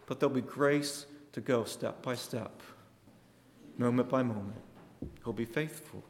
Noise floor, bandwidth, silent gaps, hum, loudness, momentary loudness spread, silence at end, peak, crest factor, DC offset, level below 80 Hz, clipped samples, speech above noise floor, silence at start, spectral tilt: -61 dBFS; 16.5 kHz; none; none; -34 LUFS; 18 LU; 0 s; -16 dBFS; 20 dB; under 0.1%; -64 dBFS; under 0.1%; 27 dB; 0.1 s; -5.5 dB/octave